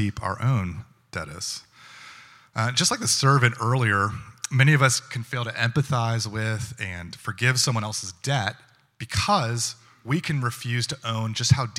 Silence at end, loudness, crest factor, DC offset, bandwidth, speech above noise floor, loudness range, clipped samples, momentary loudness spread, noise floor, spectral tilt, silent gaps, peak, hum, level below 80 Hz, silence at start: 0 s; -24 LUFS; 22 dB; under 0.1%; 15.5 kHz; 24 dB; 5 LU; under 0.1%; 15 LU; -48 dBFS; -4 dB/octave; none; -2 dBFS; none; -56 dBFS; 0 s